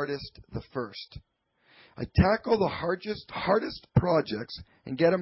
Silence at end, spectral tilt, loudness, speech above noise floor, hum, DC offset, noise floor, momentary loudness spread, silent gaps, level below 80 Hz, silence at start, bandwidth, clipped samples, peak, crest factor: 0 s; -10.5 dB/octave; -28 LUFS; 36 dB; none; under 0.1%; -64 dBFS; 16 LU; none; -44 dBFS; 0 s; 5.8 kHz; under 0.1%; -10 dBFS; 18 dB